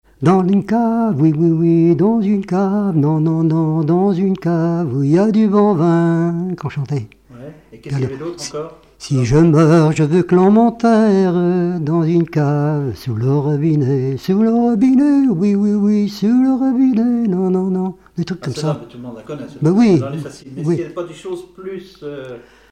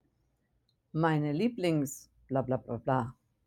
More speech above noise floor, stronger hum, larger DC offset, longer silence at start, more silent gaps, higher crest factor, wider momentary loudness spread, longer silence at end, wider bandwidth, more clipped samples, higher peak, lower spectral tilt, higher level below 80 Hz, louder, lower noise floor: second, 22 dB vs 44 dB; neither; neither; second, 0.2 s vs 0.95 s; neither; second, 12 dB vs 18 dB; first, 16 LU vs 10 LU; about the same, 0.3 s vs 0.35 s; second, 9.6 kHz vs 17 kHz; neither; first, -2 dBFS vs -14 dBFS; first, -8.5 dB/octave vs -6.5 dB/octave; first, -48 dBFS vs -66 dBFS; first, -15 LUFS vs -32 LUFS; second, -36 dBFS vs -75 dBFS